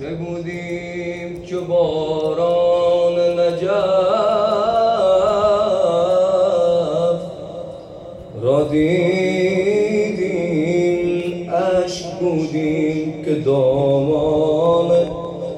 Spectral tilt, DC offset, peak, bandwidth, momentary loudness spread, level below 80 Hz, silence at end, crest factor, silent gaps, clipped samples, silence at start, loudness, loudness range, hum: -6.5 dB/octave; under 0.1%; -6 dBFS; 9.4 kHz; 11 LU; -48 dBFS; 0 s; 12 dB; none; under 0.1%; 0 s; -18 LUFS; 3 LU; none